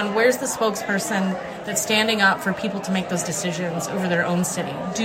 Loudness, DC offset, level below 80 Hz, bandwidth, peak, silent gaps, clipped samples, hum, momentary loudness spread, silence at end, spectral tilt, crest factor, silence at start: -22 LUFS; under 0.1%; -60 dBFS; 16 kHz; -4 dBFS; none; under 0.1%; none; 8 LU; 0 s; -3.5 dB/octave; 20 dB; 0 s